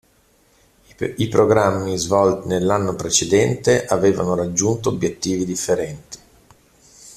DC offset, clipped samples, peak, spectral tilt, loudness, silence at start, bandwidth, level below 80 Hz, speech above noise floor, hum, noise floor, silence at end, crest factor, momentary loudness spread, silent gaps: under 0.1%; under 0.1%; 0 dBFS; -4.5 dB/octave; -19 LUFS; 1 s; 14.5 kHz; -50 dBFS; 39 dB; none; -57 dBFS; 0.05 s; 20 dB; 11 LU; none